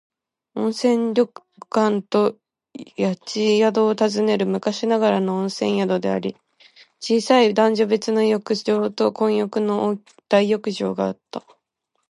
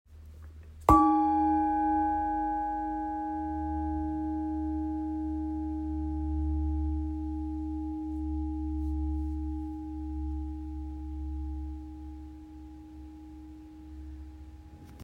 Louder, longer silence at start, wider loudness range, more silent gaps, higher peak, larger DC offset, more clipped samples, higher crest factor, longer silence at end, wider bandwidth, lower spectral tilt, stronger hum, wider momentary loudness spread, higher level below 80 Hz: first, -20 LUFS vs -31 LUFS; first, 0.55 s vs 0.1 s; second, 3 LU vs 15 LU; neither; first, -2 dBFS vs -6 dBFS; neither; neither; second, 18 dB vs 26 dB; first, 0.7 s vs 0 s; second, 11.5 kHz vs 13.5 kHz; second, -5.5 dB/octave vs -9 dB/octave; neither; second, 9 LU vs 21 LU; second, -70 dBFS vs -40 dBFS